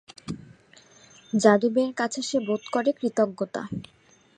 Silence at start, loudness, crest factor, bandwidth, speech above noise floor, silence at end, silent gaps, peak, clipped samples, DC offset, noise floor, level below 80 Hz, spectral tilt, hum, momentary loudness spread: 0.25 s; -25 LUFS; 24 dB; 10.5 kHz; 31 dB; 0.55 s; none; -2 dBFS; under 0.1%; under 0.1%; -55 dBFS; -62 dBFS; -5 dB/octave; none; 19 LU